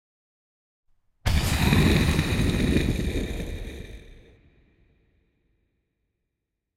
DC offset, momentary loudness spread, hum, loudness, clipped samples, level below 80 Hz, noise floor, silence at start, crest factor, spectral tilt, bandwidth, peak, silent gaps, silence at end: under 0.1%; 18 LU; none; -24 LUFS; under 0.1%; -32 dBFS; -82 dBFS; 1.25 s; 20 dB; -5.5 dB/octave; 16 kHz; -6 dBFS; none; 2.65 s